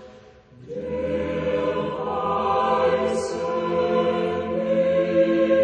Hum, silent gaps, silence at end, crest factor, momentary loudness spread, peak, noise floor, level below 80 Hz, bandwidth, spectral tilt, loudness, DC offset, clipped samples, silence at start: none; none; 0 s; 14 dB; 7 LU; -8 dBFS; -48 dBFS; -52 dBFS; 9.6 kHz; -6.5 dB/octave; -23 LUFS; under 0.1%; under 0.1%; 0 s